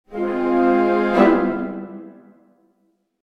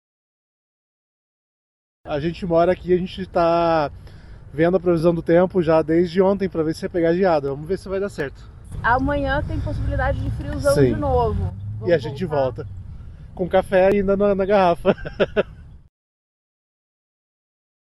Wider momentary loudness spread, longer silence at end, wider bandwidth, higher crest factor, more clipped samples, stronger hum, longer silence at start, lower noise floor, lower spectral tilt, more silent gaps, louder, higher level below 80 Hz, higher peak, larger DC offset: first, 18 LU vs 11 LU; second, 1.1 s vs 2.2 s; second, 6.2 kHz vs 12.5 kHz; about the same, 18 dB vs 18 dB; neither; neither; second, 0.1 s vs 2.05 s; first, -66 dBFS vs -40 dBFS; about the same, -8 dB/octave vs -7.5 dB/octave; neither; about the same, -18 LUFS vs -20 LUFS; second, -50 dBFS vs -36 dBFS; about the same, -2 dBFS vs -2 dBFS; neither